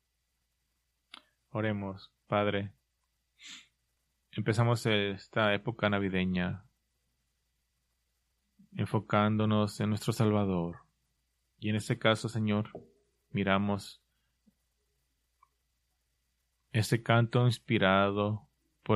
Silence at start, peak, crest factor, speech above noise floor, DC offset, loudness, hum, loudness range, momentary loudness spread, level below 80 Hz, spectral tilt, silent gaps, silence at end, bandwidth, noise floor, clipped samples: 1.55 s; -10 dBFS; 24 dB; 50 dB; under 0.1%; -31 LUFS; none; 7 LU; 16 LU; -68 dBFS; -6.5 dB/octave; none; 0 s; 13.5 kHz; -80 dBFS; under 0.1%